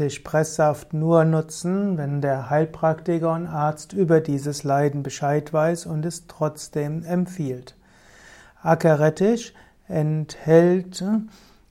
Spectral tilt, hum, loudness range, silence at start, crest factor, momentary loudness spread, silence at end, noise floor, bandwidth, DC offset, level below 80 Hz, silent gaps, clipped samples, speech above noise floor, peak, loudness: -7 dB/octave; none; 5 LU; 0 s; 20 dB; 10 LU; 0.4 s; -50 dBFS; 15 kHz; under 0.1%; -56 dBFS; none; under 0.1%; 29 dB; -2 dBFS; -22 LUFS